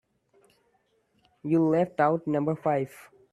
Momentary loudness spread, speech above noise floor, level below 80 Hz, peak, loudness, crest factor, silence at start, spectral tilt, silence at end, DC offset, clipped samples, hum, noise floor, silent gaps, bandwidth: 9 LU; 44 dB; -70 dBFS; -8 dBFS; -26 LUFS; 20 dB; 1.45 s; -9 dB/octave; 0.3 s; under 0.1%; under 0.1%; none; -70 dBFS; none; 13 kHz